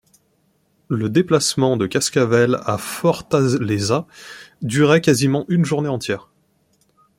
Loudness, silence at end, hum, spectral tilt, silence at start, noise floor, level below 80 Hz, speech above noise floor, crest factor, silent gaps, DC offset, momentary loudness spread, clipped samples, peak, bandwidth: -18 LUFS; 1 s; none; -5 dB/octave; 0.9 s; -63 dBFS; -56 dBFS; 45 dB; 18 dB; none; under 0.1%; 11 LU; under 0.1%; -2 dBFS; 16.5 kHz